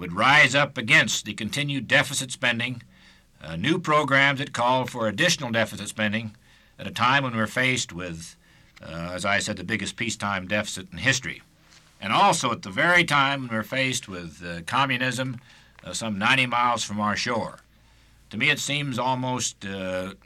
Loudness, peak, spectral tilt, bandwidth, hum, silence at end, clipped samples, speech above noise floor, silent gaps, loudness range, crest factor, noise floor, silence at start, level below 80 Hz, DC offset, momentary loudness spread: -23 LUFS; -6 dBFS; -3.5 dB/octave; 16 kHz; none; 0.1 s; under 0.1%; 32 dB; none; 4 LU; 18 dB; -56 dBFS; 0 s; -58 dBFS; under 0.1%; 17 LU